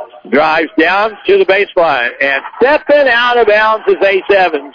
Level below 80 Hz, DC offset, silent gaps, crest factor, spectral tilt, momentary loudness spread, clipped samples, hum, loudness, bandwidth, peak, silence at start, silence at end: -48 dBFS; under 0.1%; none; 10 dB; -5 dB/octave; 4 LU; under 0.1%; none; -10 LUFS; 5.4 kHz; -2 dBFS; 0 s; 0.05 s